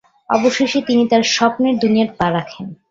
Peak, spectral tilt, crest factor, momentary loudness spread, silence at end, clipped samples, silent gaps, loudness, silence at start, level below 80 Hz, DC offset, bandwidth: -2 dBFS; -4.5 dB/octave; 16 dB; 8 LU; 0.15 s; under 0.1%; none; -16 LUFS; 0.3 s; -52 dBFS; under 0.1%; 7.8 kHz